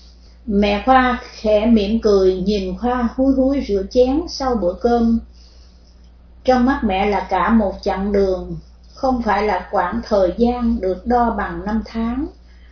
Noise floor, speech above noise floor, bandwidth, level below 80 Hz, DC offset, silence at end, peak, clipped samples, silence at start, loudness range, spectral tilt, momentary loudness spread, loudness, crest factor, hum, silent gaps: -45 dBFS; 28 dB; 5.4 kHz; -34 dBFS; under 0.1%; 0.4 s; -2 dBFS; under 0.1%; 0.45 s; 3 LU; -6.5 dB/octave; 9 LU; -18 LUFS; 16 dB; none; none